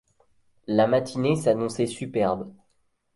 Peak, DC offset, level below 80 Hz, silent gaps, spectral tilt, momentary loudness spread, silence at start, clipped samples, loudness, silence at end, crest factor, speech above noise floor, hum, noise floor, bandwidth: -8 dBFS; under 0.1%; -60 dBFS; none; -6.5 dB/octave; 11 LU; 0.7 s; under 0.1%; -25 LUFS; 0.65 s; 18 dB; 45 dB; none; -69 dBFS; 11.5 kHz